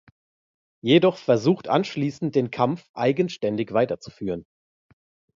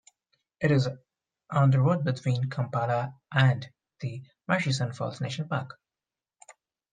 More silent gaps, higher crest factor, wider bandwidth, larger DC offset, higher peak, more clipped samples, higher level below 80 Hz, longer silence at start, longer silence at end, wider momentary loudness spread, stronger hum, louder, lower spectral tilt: first, 2.89-2.94 s vs none; about the same, 20 dB vs 22 dB; second, 7.6 kHz vs 9.4 kHz; neither; about the same, -4 dBFS vs -6 dBFS; neither; about the same, -62 dBFS vs -64 dBFS; first, 0.85 s vs 0.6 s; second, 0.95 s vs 1.2 s; about the same, 13 LU vs 14 LU; neither; first, -23 LUFS vs -28 LUFS; about the same, -7 dB/octave vs -6.5 dB/octave